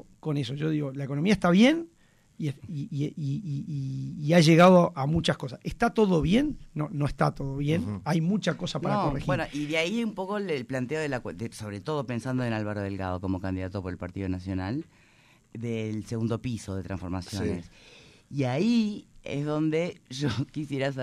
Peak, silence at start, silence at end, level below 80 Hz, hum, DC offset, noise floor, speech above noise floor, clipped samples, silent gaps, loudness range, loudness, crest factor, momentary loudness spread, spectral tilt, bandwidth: -8 dBFS; 0.25 s; 0 s; -50 dBFS; none; under 0.1%; -60 dBFS; 33 dB; under 0.1%; none; 11 LU; -28 LUFS; 20 dB; 13 LU; -6.5 dB/octave; 13 kHz